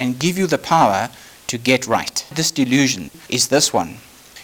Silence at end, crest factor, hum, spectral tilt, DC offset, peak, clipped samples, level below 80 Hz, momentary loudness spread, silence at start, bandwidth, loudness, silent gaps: 0 s; 16 dB; none; -3.5 dB/octave; under 0.1%; -2 dBFS; under 0.1%; -54 dBFS; 11 LU; 0 s; over 20 kHz; -18 LUFS; none